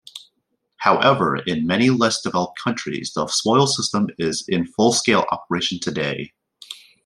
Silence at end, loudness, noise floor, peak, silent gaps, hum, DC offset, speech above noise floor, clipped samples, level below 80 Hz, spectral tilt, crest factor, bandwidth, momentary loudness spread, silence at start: 0.3 s; -20 LUFS; -72 dBFS; -2 dBFS; none; none; under 0.1%; 52 dB; under 0.1%; -60 dBFS; -4 dB/octave; 20 dB; 12.5 kHz; 14 LU; 0.15 s